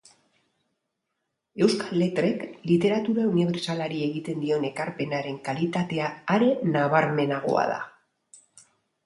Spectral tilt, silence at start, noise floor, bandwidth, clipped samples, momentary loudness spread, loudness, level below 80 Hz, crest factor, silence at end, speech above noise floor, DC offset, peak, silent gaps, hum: -6.5 dB/octave; 1.55 s; -81 dBFS; 11.5 kHz; under 0.1%; 8 LU; -25 LUFS; -68 dBFS; 20 dB; 1.15 s; 56 dB; under 0.1%; -6 dBFS; none; none